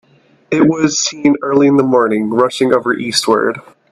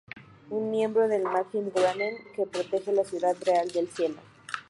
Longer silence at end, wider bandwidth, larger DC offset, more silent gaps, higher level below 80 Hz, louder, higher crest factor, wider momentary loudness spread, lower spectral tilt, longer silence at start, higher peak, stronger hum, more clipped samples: first, 0.3 s vs 0.05 s; about the same, 12.5 kHz vs 11.5 kHz; neither; neither; first, -56 dBFS vs -74 dBFS; first, -13 LUFS vs -28 LUFS; about the same, 14 dB vs 16 dB; second, 4 LU vs 10 LU; about the same, -4 dB/octave vs -5 dB/octave; first, 0.5 s vs 0.15 s; first, 0 dBFS vs -12 dBFS; neither; neither